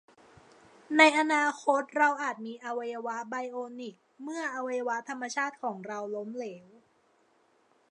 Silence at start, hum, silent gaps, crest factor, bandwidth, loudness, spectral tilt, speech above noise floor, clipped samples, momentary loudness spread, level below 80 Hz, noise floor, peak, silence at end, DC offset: 0.9 s; none; none; 26 dB; 11 kHz; -29 LUFS; -3 dB/octave; 38 dB; under 0.1%; 19 LU; -84 dBFS; -68 dBFS; -6 dBFS; 1.3 s; under 0.1%